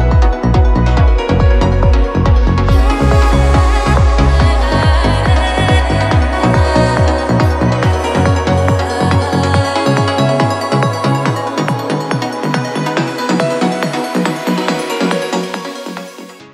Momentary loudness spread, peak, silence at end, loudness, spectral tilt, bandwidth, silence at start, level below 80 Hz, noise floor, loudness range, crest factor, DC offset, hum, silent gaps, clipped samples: 6 LU; 0 dBFS; 0.05 s; -13 LUFS; -6.5 dB/octave; 13 kHz; 0 s; -16 dBFS; -32 dBFS; 4 LU; 12 dB; under 0.1%; none; none; under 0.1%